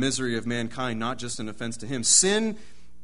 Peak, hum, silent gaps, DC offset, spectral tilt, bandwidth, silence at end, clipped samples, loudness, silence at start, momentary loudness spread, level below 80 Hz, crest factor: -6 dBFS; none; none; 1%; -2.5 dB/octave; 11 kHz; 0.4 s; under 0.1%; -25 LUFS; 0 s; 15 LU; -56 dBFS; 22 dB